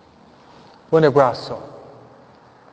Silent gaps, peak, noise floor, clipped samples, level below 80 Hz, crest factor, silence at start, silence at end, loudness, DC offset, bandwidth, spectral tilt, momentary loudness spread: none; 0 dBFS; -49 dBFS; under 0.1%; -58 dBFS; 22 dB; 0.9 s; 1.05 s; -17 LUFS; under 0.1%; 8 kHz; -7.5 dB/octave; 19 LU